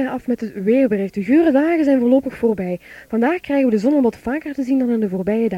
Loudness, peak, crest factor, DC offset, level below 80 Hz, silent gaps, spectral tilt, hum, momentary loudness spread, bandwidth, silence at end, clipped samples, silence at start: -18 LUFS; -4 dBFS; 14 dB; under 0.1%; -52 dBFS; none; -8 dB/octave; none; 9 LU; 12.5 kHz; 0 s; under 0.1%; 0 s